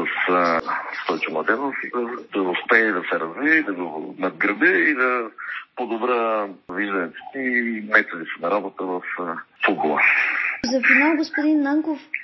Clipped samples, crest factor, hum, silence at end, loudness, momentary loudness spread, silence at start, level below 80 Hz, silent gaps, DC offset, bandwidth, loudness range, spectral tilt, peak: under 0.1%; 22 dB; none; 0 s; -21 LUFS; 12 LU; 0 s; -70 dBFS; none; under 0.1%; 6.2 kHz; 4 LU; -5 dB/octave; 0 dBFS